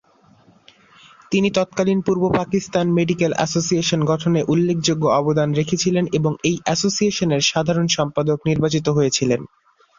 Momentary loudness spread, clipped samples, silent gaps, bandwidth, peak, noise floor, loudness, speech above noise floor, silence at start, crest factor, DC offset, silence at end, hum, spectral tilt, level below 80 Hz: 3 LU; under 0.1%; none; 7.6 kHz; -2 dBFS; -53 dBFS; -19 LUFS; 35 dB; 1.3 s; 16 dB; under 0.1%; 0.55 s; none; -5 dB/octave; -52 dBFS